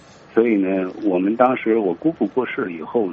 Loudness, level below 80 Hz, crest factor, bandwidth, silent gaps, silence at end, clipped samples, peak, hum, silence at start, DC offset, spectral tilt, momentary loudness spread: -20 LUFS; -64 dBFS; 18 dB; 6.8 kHz; none; 0 s; under 0.1%; 0 dBFS; none; 0.35 s; under 0.1%; -6 dB/octave; 6 LU